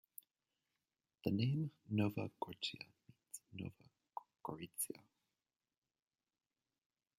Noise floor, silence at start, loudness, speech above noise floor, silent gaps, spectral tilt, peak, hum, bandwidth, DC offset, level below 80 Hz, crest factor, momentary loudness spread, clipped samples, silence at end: under -90 dBFS; 1.25 s; -43 LUFS; over 48 dB; none; -5 dB/octave; -22 dBFS; none; 16 kHz; under 0.1%; -82 dBFS; 24 dB; 16 LU; under 0.1%; 2.25 s